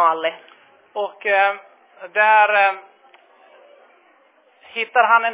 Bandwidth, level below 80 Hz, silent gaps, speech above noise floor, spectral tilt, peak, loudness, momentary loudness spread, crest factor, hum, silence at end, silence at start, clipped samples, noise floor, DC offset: 4 kHz; -88 dBFS; none; 38 dB; -4.5 dB/octave; -2 dBFS; -17 LUFS; 18 LU; 18 dB; none; 0 s; 0 s; under 0.1%; -56 dBFS; under 0.1%